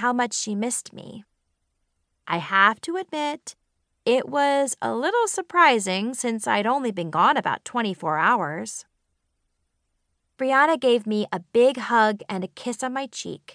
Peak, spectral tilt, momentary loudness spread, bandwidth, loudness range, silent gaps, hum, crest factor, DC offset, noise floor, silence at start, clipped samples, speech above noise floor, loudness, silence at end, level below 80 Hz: -4 dBFS; -3.5 dB/octave; 13 LU; 10.5 kHz; 4 LU; none; none; 20 dB; under 0.1%; -74 dBFS; 0 s; under 0.1%; 51 dB; -23 LUFS; 0.05 s; -76 dBFS